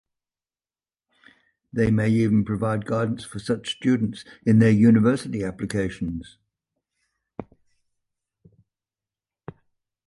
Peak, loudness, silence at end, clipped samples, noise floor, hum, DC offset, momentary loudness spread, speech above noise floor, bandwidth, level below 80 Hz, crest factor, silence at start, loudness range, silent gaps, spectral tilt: -6 dBFS; -22 LUFS; 2.65 s; under 0.1%; under -90 dBFS; none; under 0.1%; 16 LU; over 69 dB; 11.5 kHz; -52 dBFS; 18 dB; 1.75 s; 13 LU; none; -7.5 dB/octave